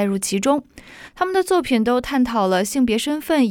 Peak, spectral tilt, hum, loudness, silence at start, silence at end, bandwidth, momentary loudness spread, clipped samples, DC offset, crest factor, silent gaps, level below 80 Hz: -4 dBFS; -4.5 dB/octave; none; -19 LUFS; 0 s; 0 s; 18.5 kHz; 4 LU; under 0.1%; under 0.1%; 16 dB; none; -48 dBFS